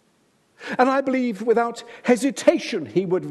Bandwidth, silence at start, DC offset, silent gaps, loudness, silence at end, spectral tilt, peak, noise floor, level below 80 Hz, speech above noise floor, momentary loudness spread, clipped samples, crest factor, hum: 12.5 kHz; 0.6 s; under 0.1%; none; -22 LUFS; 0 s; -5 dB/octave; -2 dBFS; -63 dBFS; -74 dBFS; 42 dB; 9 LU; under 0.1%; 20 dB; none